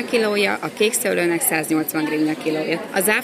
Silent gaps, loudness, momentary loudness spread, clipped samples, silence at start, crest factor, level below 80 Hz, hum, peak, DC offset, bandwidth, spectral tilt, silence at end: none; -20 LUFS; 4 LU; under 0.1%; 0 s; 16 dB; -66 dBFS; none; -4 dBFS; under 0.1%; 16 kHz; -3 dB/octave; 0 s